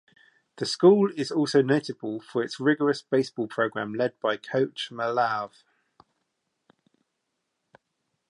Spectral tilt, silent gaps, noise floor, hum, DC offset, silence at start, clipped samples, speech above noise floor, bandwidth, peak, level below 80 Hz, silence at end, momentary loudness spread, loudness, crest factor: -5.5 dB/octave; none; -80 dBFS; none; under 0.1%; 0.55 s; under 0.1%; 55 dB; 11 kHz; -6 dBFS; -78 dBFS; 2.8 s; 11 LU; -25 LUFS; 22 dB